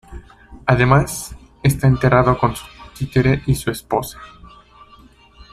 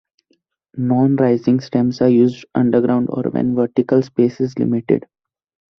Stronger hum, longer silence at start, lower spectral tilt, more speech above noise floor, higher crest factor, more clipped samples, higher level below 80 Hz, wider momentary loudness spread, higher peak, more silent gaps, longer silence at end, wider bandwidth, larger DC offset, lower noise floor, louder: neither; second, 0.1 s vs 0.75 s; second, -6.5 dB/octave vs -9 dB/octave; second, 31 dB vs 49 dB; about the same, 18 dB vs 16 dB; neither; first, -36 dBFS vs -58 dBFS; first, 18 LU vs 6 LU; about the same, 0 dBFS vs -2 dBFS; neither; first, 1.25 s vs 0.8 s; first, 15 kHz vs 6.4 kHz; neither; second, -47 dBFS vs -64 dBFS; about the same, -18 LUFS vs -17 LUFS